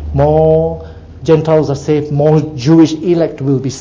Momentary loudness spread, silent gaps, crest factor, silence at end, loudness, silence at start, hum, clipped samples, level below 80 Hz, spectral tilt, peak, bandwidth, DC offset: 6 LU; none; 12 dB; 0 s; -12 LUFS; 0 s; none; under 0.1%; -30 dBFS; -8 dB/octave; 0 dBFS; 7.6 kHz; under 0.1%